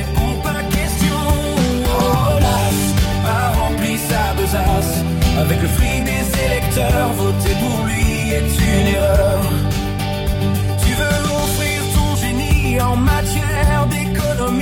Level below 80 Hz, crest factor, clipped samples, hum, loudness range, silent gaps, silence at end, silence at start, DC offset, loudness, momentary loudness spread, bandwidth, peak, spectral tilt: -22 dBFS; 12 dB; under 0.1%; none; 1 LU; none; 0 s; 0 s; under 0.1%; -17 LUFS; 4 LU; 17 kHz; -4 dBFS; -5 dB/octave